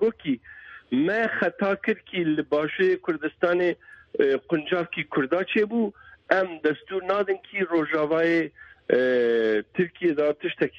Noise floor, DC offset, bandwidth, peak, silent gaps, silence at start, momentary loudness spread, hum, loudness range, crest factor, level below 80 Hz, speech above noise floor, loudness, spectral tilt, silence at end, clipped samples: -46 dBFS; under 0.1%; 7 kHz; -4 dBFS; none; 0 s; 8 LU; none; 2 LU; 20 dB; -66 dBFS; 22 dB; -25 LUFS; -7.5 dB/octave; 0 s; under 0.1%